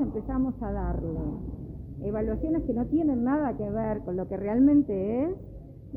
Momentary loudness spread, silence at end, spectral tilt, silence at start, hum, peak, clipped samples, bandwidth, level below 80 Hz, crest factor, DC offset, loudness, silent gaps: 15 LU; 0 s; -12.5 dB/octave; 0 s; none; -12 dBFS; under 0.1%; 2.9 kHz; -40 dBFS; 16 dB; under 0.1%; -28 LUFS; none